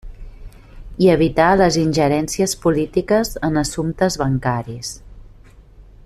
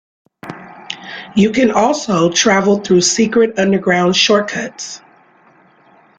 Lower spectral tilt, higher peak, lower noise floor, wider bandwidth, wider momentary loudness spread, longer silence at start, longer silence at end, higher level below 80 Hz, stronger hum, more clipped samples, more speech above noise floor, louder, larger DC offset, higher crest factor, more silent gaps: first, -5.5 dB/octave vs -4 dB/octave; about the same, -2 dBFS vs 0 dBFS; second, -44 dBFS vs -49 dBFS; first, 14.5 kHz vs 9.4 kHz; second, 13 LU vs 18 LU; second, 0.05 s vs 0.45 s; second, 0.25 s vs 1.2 s; first, -36 dBFS vs -54 dBFS; neither; neither; second, 27 dB vs 36 dB; second, -17 LUFS vs -13 LUFS; neither; about the same, 16 dB vs 14 dB; neither